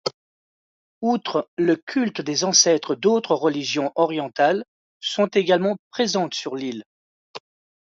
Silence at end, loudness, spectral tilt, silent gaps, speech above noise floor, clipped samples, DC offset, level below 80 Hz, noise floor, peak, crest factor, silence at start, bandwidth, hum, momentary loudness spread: 0.45 s; -21 LUFS; -3 dB/octave; 0.14-1.01 s, 1.48-1.57 s, 1.83-1.87 s, 4.68-5.00 s, 5.79-5.91 s, 6.86-7.34 s; over 69 dB; under 0.1%; under 0.1%; -72 dBFS; under -90 dBFS; -4 dBFS; 20 dB; 0.05 s; 8 kHz; none; 13 LU